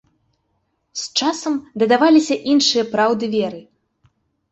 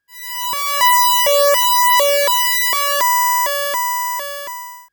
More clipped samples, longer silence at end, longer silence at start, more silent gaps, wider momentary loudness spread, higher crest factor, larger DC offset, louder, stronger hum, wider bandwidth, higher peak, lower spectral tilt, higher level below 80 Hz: neither; first, 0.9 s vs 0.1 s; first, 0.95 s vs 0.15 s; neither; about the same, 14 LU vs 13 LU; about the same, 16 dB vs 16 dB; neither; second, -17 LUFS vs -14 LUFS; neither; second, 8.2 kHz vs over 20 kHz; second, -4 dBFS vs 0 dBFS; first, -3.5 dB/octave vs 3 dB/octave; about the same, -66 dBFS vs -64 dBFS